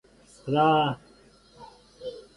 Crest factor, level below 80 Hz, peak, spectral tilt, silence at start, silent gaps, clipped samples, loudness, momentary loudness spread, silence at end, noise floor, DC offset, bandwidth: 18 dB; -62 dBFS; -10 dBFS; -7 dB/octave; 0.45 s; none; under 0.1%; -24 LUFS; 20 LU; 0.15 s; -56 dBFS; under 0.1%; 11.5 kHz